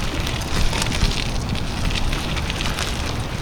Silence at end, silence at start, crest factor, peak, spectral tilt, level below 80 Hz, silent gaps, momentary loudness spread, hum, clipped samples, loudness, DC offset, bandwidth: 0 s; 0 s; 20 dB; 0 dBFS; -4 dB/octave; -24 dBFS; none; 4 LU; none; under 0.1%; -23 LUFS; 0.6%; 19 kHz